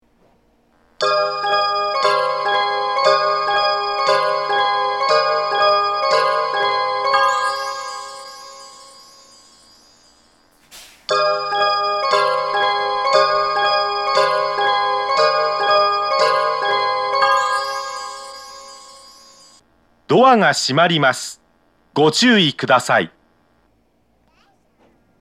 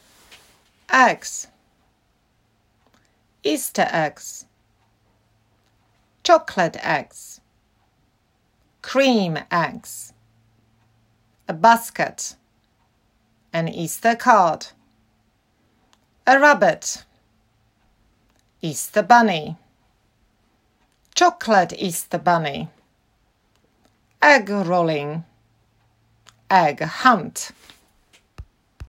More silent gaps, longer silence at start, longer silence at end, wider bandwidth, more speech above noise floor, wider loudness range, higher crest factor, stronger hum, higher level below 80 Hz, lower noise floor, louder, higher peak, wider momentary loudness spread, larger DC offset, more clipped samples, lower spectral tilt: neither; about the same, 1 s vs 0.9 s; first, 2.1 s vs 0 s; second, 13.5 kHz vs 16 kHz; about the same, 46 dB vs 46 dB; about the same, 6 LU vs 5 LU; about the same, 18 dB vs 22 dB; neither; about the same, -64 dBFS vs -62 dBFS; second, -61 dBFS vs -65 dBFS; about the same, -17 LUFS vs -19 LUFS; about the same, 0 dBFS vs 0 dBFS; second, 14 LU vs 21 LU; neither; neither; about the same, -3.5 dB/octave vs -4 dB/octave